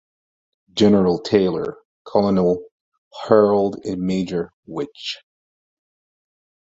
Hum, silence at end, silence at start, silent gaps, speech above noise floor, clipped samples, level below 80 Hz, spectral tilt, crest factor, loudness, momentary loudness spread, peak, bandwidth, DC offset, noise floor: none; 1.6 s; 0.75 s; 1.85-2.05 s, 2.71-2.92 s, 2.98-3.11 s, 4.53-4.63 s; over 71 dB; under 0.1%; -54 dBFS; -7 dB/octave; 20 dB; -20 LUFS; 15 LU; -2 dBFS; 7.8 kHz; under 0.1%; under -90 dBFS